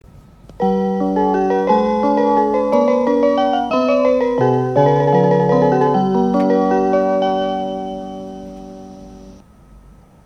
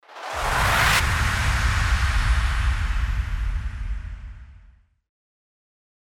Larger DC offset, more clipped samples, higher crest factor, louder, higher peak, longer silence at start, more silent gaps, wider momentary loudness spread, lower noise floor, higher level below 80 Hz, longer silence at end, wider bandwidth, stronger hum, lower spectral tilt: neither; neither; about the same, 14 dB vs 16 dB; first, -16 LUFS vs -23 LUFS; first, -2 dBFS vs -8 dBFS; about the same, 0.15 s vs 0.1 s; neither; about the same, 15 LU vs 15 LU; second, -44 dBFS vs -53 dBFS; second, -46 dBFS vs -26 dBFS; second, 0.5 s vs 1.6 s; second, 9.6 kHz vs 17 kHz; neither; first, -8 dB/octave vs -3.5 dB/octave